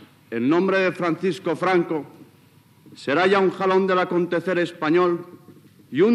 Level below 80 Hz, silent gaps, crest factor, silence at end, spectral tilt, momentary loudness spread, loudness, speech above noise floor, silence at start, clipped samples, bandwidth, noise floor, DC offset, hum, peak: -80 dBFS; none; 16 dB; 0 s; -6.5 dB/octave; 10 LU; -21 LUFS; 33 dB; 0 s; under 0.1%; 11.5 kHz; -54 dBFS; under 0.1%; none; -6 dBFS